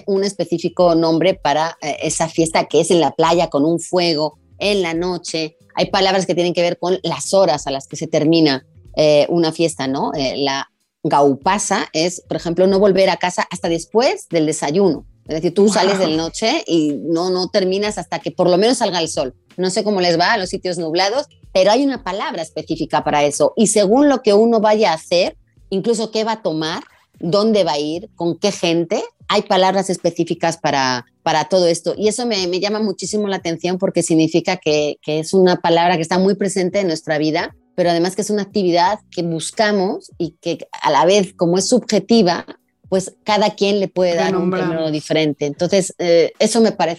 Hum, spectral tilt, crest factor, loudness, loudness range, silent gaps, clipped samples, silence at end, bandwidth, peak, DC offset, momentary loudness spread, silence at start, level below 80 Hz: none; -4.5 dB/octave; 14 dB; -17 LUFS; 3 LU; none; under 0.1%; 0 s; 12.5 kHz; -4 dBFS; under 0.1%; 9 LU; 0.05 s; -52 dBFS